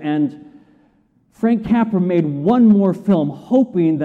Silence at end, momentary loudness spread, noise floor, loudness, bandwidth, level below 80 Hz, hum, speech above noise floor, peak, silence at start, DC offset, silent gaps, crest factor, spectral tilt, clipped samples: 0 s; 8 LU; -57 dBFS; -16 LUFS; 4.4 kHz; -52 dBFS; none; 42 dB; -4 dBFS; 0 s; under 0.1%; none; 12 dB; -10 dB/octave; under 0.1%